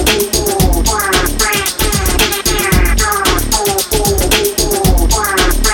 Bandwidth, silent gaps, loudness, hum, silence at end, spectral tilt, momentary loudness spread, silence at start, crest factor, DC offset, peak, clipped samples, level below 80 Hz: 17.5 kHz; none; -12 LUFS; none; 0 s; -3 dB/octave; 2 LU; 0 s; 12 dB; under 0.1%; 0 dBFS; under 0.1%; -16 dBFS